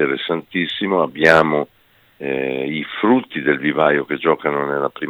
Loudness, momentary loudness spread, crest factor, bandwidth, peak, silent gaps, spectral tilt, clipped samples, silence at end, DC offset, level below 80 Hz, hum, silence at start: -18 LUFS; 10 LU; 18 dB; over 20 kHz; 0 dBFS; none; -6 dB/octave; under 0.1%; 0 s; under 0.1%; -58 dBFS; none; 0 s